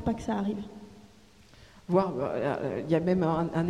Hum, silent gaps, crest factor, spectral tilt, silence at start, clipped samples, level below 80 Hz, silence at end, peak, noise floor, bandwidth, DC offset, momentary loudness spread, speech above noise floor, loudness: none; none; 18 dB; -8 dB/octave; 0 s; under 0.1%; -54 dBFS; 0 s; -12 dBFS; -56 dBFS; 10.5 kHz; under 0.1%; 15 LU; 28 dB; -29 LUFS